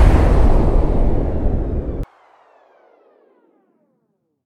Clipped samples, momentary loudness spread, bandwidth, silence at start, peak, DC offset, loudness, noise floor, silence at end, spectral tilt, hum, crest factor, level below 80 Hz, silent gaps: under 0.1%; 13 LU; 8.8 kHz; 0 s; 0 dBFS; under 0.1%; -19 LUFS; -68 dBFS; 2.4 s; -9 dB/octave; none; 16 dB; -18 dBFS; none